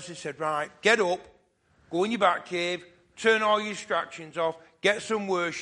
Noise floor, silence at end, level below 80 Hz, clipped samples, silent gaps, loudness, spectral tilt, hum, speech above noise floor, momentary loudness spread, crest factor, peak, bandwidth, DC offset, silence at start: -65 dBFS; 0 s; -70 dBFS; under 0.1%; none; -27 LUFS; -3.5 dB/octave; none; 38 dB; 10 LU; 22 dB; -6 dBFS; 11.5 kHz; under 0.1%; 0 s